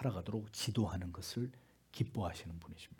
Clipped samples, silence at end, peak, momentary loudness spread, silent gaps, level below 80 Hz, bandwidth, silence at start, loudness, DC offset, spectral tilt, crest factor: under 0.1%; 0.05 s; -22 dBFS; 12 LU; none; -64 dBFS; 18 kHz; 0 s; -41 LUFS; under 0.1%; -5.5 dB/octave; 20 dB